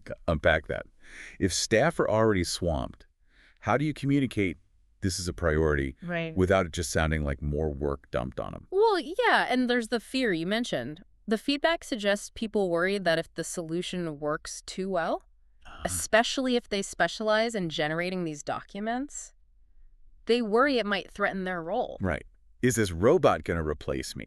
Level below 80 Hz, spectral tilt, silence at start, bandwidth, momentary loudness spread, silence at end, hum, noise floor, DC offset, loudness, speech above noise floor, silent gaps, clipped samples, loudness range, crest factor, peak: -44 dBFS; -4.5 dB/octave; 0.05 s; 13.5 kHz; 11 LU; 0 s; none; -61 dBFS; under 0.1%; -28 LUFS; 33 dB; none; under 0.1%; 3 LU; 20 dB; -8 dBFS